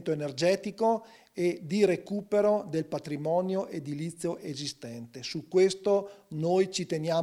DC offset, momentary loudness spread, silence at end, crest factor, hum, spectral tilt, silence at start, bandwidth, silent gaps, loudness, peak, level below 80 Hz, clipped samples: under 0.1%; 11 LU; 0 s; 18 dB; none; -5.5 dB/octave; 0 s; 14 kHz; none; -29 LUFS; -12 dBFS; -72 dBFS; under 0.1%